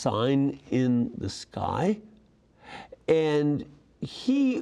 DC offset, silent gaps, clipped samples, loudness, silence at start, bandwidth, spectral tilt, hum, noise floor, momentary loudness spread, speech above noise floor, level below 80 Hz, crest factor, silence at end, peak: under 0.1%; none; under 0.1%; -27 LUFS; 0 s; 10.5 kHz; -7 dB/octave; none; -59 dBFS; 17 LU; 33 dB; -60 dBFS; 18 dB; 0 s; -10 dBFS